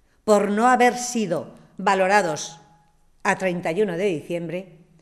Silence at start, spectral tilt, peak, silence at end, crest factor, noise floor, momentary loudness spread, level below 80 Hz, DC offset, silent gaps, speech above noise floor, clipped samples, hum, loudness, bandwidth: 0.25 s; -4.5 dB/octave; -4 dBFS; 0.35 s; 20 dB; -57 dBFS; 13 LU; -60 dBFS; under 0.1%; none; 36 dB; under 0.1%; none; -22 LUFS; 13.5 kHz